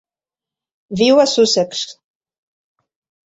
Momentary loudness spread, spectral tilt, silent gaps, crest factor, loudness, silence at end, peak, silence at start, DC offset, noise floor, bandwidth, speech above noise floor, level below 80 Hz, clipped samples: 16 LU; -3.5 dB/octave; none; 18 dB; -14 LUFS; 1.35 s; -2 dBFS; 0.9 s; under 0.1%; -89 dBFS; 8 kHz; 75 dB; -58 dBFS; under 0.1%